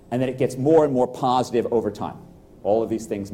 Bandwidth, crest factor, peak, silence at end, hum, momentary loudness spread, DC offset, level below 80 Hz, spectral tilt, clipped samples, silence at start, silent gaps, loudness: 15.5 kHz; 16 dB; -6 dBFS; 0 s; none; 12 LU; under 0.1%; -54 dBFS; -7 dB/octave; under 0.1%; 0.1 s; none; -22 LUFS